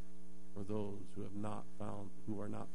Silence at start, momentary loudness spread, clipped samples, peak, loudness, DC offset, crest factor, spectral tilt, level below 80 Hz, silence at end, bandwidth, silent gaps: 0 s; 11 LU; under 0.1%; -28 dBFS; -47 LUFS; 2%; 18 dB; -7.5 dB/octave; -68 dBFS; 0 s; 10.5 kHz; none